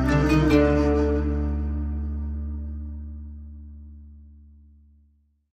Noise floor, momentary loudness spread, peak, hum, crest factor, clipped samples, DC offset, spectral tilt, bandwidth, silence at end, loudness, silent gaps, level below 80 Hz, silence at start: -62 dBFS; 24 LU; -8 dBFS; none; 18 dB; under 0.1%; under 0.1%; -8 dB/octave; 8.8 kHz; 1.2 s; -24 LUFS; none; -30 dBFS; 0 s